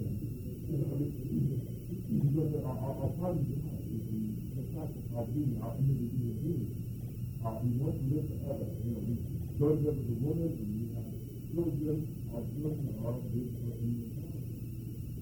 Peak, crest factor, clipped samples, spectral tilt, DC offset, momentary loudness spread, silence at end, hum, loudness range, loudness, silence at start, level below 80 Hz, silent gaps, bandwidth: -18 dBFS; 16 dB; under 0.1%; -10 dB/octave; under 0.1%; 9 LU; 0 s; none; 2 LU; -36 LUFS; 0 s; -50 dBFS; none; 19.5 kHz